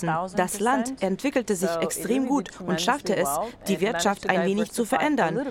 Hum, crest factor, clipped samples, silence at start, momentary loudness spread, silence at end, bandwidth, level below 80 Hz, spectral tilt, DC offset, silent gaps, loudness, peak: none; 20 dB; under 0.1%; 0 s; 4 LU; 0 s; 16.5 kHz; -56 dBFS; -4.5 dB/octave; under 0.1%; none; -25 LUFS; -6 dBFS